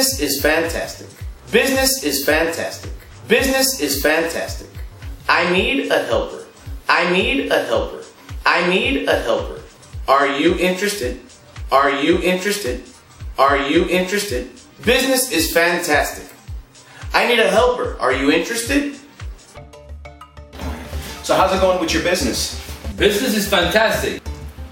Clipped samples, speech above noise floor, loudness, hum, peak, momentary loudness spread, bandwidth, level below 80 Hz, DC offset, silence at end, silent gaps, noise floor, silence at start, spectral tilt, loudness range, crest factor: under 0.1%; 22 dB; -17 LUFS; none; 0 dBFS; 20 LU; 17 kHz; -34 dBFS; under 0.1%; 0 s; none; -40 dBFS; 0 s; -3.5 dB/octave; 3 LU; 18 dB